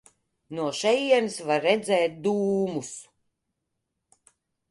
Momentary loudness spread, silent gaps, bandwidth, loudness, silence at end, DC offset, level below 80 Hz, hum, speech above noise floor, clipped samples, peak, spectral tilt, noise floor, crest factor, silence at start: 14 LU; none; 11.5 kHz; -25 LUFS; 1.7 s; under 0.1%; -72 dBFS; none; 56 dB; under 0.1%; -8 dBFS; -4 dB/octave; -81 dBFS; 20 dB; 0.5 s